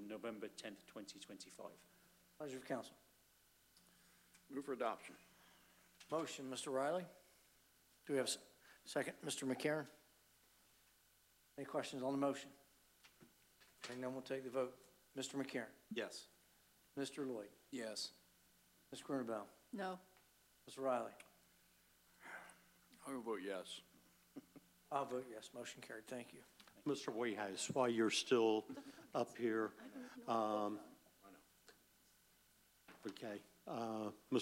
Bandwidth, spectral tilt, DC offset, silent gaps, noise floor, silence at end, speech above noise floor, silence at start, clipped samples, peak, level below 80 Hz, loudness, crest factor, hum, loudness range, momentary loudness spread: 16 kHz; -4 dB/octave; under 0.1%; none; -74 dBFS; 0 s; 30 dB; 0 s; under 0.1%; -24 dBFS; -86 dBFS; -45 LUFS; 24 dB; none; 11 LU; 19 LU